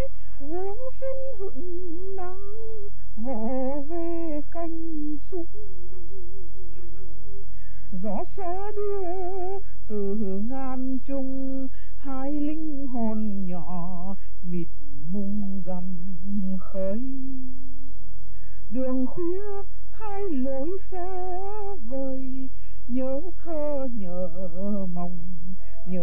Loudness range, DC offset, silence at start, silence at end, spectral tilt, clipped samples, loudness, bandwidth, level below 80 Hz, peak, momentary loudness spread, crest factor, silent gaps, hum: 4 LU; 20%; 0 s; 0 s; -10.5 dB/octave; under 0.1%; -33 LUFS; 17 kHz; -44 dBFS; -10 dBFS; 17 LU; 14 dB; none; none